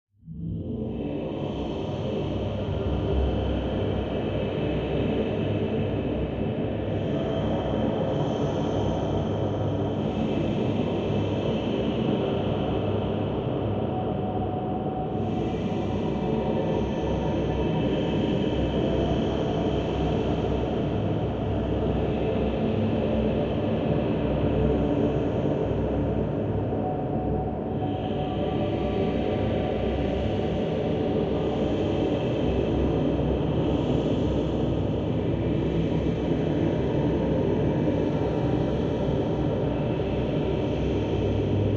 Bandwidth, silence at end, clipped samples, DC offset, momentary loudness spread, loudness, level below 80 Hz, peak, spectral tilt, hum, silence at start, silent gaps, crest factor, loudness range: 7.2 kHz; 0 s; under 0.1%; under 0.1%; 4 LU; -26 LUFS; -38 dBFS; -12 dBFS; -8.5 dB/octave; none; 0.25 s; none; 14 dB; 2 LU